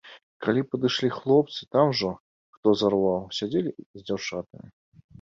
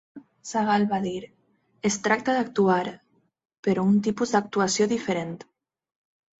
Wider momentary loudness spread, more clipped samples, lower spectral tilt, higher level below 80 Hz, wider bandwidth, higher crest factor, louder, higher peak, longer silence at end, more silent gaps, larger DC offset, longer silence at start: about the same, 12 LU vs 11 LU; neither; about the same, -6 dB/octave vs -5 dB/octave; about the same, -62 dBFS vs -66 dBFS; about the same, 7.6 kHz vs 8.2 kHz; about the same, 18 dB vs 20 dB; about the same, -25 LUFS vs -25 LUFS; about the same, -8 dBFS vs -6 dBFS; second, 0.8 s vs 1 s; first, 0.23-0.40 s, 2.20-2.63 s, 3.86-3.94 s vs 3.58-3.63 s; neither; about the same, 0.05 s vs 0.15 s